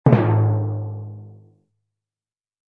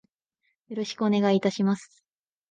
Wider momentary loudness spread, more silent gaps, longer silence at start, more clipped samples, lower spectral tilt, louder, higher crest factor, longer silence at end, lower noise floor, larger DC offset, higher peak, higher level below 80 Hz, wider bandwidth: first, 21 LU vs 11 LU; neither; second, 0.05 s vs 0.7 s; neither; first, -11.5 dB/octave vs -6.5 dB/octave; first, -20 LUFS vs -26 LUFS; about the same, 20 dB vs 16 dB; first, 1.4 s vs 0.65 s; first, under -90 dBFS vs -77 dBFS; neither; first, 0 dBFS vs -12 dBFS; first, -56 dBFS vs -74 dBFS; second, 4 kHz vs 9.2 kHz